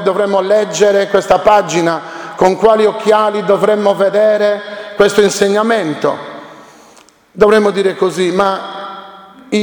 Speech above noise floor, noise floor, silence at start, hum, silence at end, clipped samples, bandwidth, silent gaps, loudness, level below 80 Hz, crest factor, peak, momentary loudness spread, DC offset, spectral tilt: 33 dB; -44 dBFS; 0 s; none; 0 s; 0.2%; 20 kHz; none; -12 LUFS; -48 dBFS; 12 dB; 0 dBFS; 14 LU; under 0.1%; -4.5 dB/octave